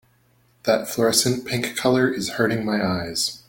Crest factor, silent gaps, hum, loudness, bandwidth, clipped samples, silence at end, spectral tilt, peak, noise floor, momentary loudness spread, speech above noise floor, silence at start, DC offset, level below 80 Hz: 18 dB; none; none; -21 LUFS; 17 kHz; under 0.1%; 0.1 s; -3.5 dB/octave; -4 dBFS; -60 dBFS; 6 LU; 39 dB; 0.65 s; under 0.1%; -56 dBFS